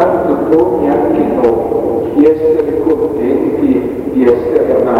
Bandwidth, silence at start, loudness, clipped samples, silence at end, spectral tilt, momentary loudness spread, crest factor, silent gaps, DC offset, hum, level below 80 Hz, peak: 13.5 kHz; 0 s; -12 LUFS; under 0.1%; 0 s; -9 dB/octave; 4 LU; 10 dB; none; under 0.1%; none; -38 dBFS; 0 dBFS